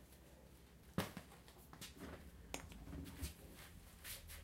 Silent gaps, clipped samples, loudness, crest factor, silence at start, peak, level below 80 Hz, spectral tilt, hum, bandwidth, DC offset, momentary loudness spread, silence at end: none; under 0.1%; -52 LUFS; 30 dB; 0 s; -24 dBFS; -60 dBFS; -4 dB/octave; none; 16 kHz; under 0.1%; 16 LU; 0 s